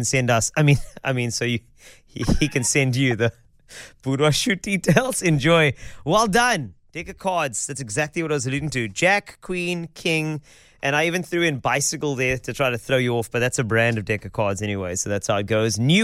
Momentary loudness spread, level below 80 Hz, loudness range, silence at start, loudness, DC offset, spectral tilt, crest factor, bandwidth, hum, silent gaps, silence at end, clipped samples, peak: 9 LU; -42 dBFS; 3 LU; 0 s; -21 LUFS; under 0.1%; -4.5 dB/octave; 20 dB; 15.5 kHz; none; none; 0 s; under 0.1%; -2 dBFS